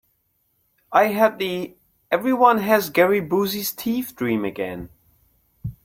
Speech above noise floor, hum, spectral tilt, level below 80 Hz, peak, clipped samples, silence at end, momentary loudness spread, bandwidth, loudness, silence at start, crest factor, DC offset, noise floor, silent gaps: 48 dB; none; -5 dB/octave; -54 dBFS; -2 dBFS; under 0.1%; 0.15 s; 17 LU; 16.5 kHz; -21 LUFS; 0.9 s; 20 dB; under 0.1%; -68 dBFS; none